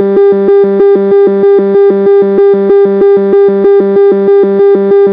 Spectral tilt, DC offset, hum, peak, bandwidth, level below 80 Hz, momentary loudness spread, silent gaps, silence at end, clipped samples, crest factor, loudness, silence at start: -11 dB/octave; under 0.1%; none; 0 dBFS; 4.7 kHz; -50 dBFS; 1 LU; none; 0 s; under 0.1%; 6 dB; -6 LUFS; 0 s